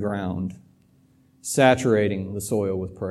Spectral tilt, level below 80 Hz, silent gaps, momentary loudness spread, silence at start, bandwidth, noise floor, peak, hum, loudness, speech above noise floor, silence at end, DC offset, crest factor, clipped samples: -5.5 dB/octave; -56 dBFS; none; 13 LU; 0 s; 15.5 kHz; -58 dBFS; -4 dBFS; none; -23 LUFS; 36 dB; 0 s; under 0.1%; 20 dB; under 0.1%